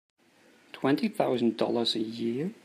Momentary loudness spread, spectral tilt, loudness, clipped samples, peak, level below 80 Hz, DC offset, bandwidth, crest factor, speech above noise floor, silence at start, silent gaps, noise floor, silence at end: 5 LU; -5.5 dB/octave; -29 LUFS; under 0.1%; -10 dBFS; -78 dBFS; under 0.1%; 15.5 kHz; 20 dB; 33 dB; 0.75 s; none; -61 dBFS; 0.1 s